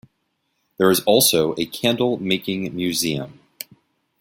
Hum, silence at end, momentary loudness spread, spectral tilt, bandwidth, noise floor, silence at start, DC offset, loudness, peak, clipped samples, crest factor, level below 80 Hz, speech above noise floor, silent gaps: none; 0.9 s; 22 LU; -3.5 dB/octave; 16.5 kHz; -72 dBFS; 0.8 s; under 0.1%; -19 LUFS; -2 dBFS; under 0.1%; 20 dB; -58 dBFS; 52 dB; none